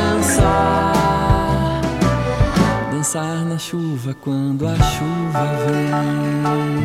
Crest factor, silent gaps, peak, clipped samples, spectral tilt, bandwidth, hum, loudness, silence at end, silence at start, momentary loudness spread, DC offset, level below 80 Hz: 14 dB; none; -4 dBFS; under 0.1%; -5.5 dB/octave; 16 kHz; none; -18 LUFS; 0 s; 0 s; 7 LU; under 0.1%; -28 dBFS